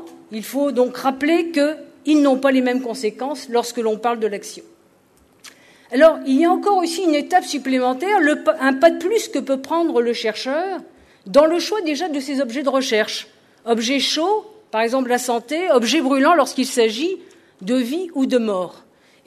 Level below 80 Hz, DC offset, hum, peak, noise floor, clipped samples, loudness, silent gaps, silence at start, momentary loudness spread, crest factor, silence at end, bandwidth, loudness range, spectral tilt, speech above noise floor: -64 dBFS; under 0.1%; none; -2 dBFS; -55 dBFS; under 0.1%; -19 LUFS; none; 0 s; 10 LU; 16 dB; 0.5 s; 13.5 kHz; 3 LU; -3 dB/octave; 37 dB